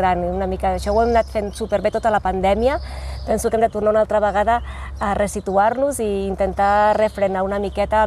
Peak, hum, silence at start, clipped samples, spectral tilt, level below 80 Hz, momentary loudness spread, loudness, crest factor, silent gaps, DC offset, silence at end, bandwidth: -4 dBFS; none; 0 s; under 0.1%; -5.5 dB/octave; -32 dBFS; 6 LU; -19 LUFS; 14 dB; none; under 0.1%; 0 s; 13 kHz